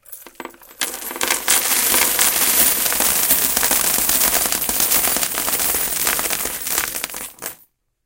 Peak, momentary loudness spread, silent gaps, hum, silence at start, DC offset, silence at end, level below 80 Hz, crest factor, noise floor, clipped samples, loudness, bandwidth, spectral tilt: 0 dBFS; 15 LU; none; none; 0.1 s; under 0.1%; 0.5 s; -46 dBFS; 20 dB; -55 dBFS; under 0.1%; -15 LUFS; 18 kHz; 0.5 dB/octave